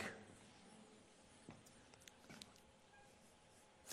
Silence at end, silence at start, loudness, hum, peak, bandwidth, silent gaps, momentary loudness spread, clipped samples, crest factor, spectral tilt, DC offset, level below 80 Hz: 0 s; 0 s; -62 LUFS; none; -30 dBFS; 13 kHz; none; 8 LU; under 0.1%; 30 dB; -3 dB/octave; under 0.1%; -82 dBFS